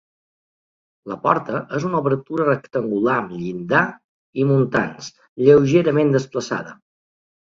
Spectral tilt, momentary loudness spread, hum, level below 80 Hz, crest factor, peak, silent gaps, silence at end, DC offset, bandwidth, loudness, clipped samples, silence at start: -7 dB/octave; 14 LU; none; -58 dBFS; 20 dB; 0 dBFS; 4.04-4.33 s, 5.29-5.36 s; 0.75 s; under 0.1%; 7.6 kHz; -19 LUFS; under 0.1%; 1.05 s